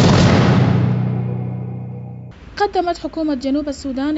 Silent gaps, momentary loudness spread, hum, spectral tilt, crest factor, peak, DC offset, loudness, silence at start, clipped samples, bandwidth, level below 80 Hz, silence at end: none; 18 LU; none; -6.5 dB/octave; 14 dB; -2 dBFS; under 0.1%; -18 LUFS; 0 s; under 0.1%; 8 kHz; -38 dBFS; 0 s